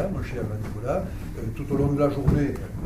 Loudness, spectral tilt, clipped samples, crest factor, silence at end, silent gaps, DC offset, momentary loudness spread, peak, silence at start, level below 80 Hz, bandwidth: -26 LUFS; -8.5 dB/octave; under 0.1%; 18 dB; 0 s; none; under 0.1%; 11 LU; -8 dBFS; 0 s; -36 dBFS; 15.5 kHz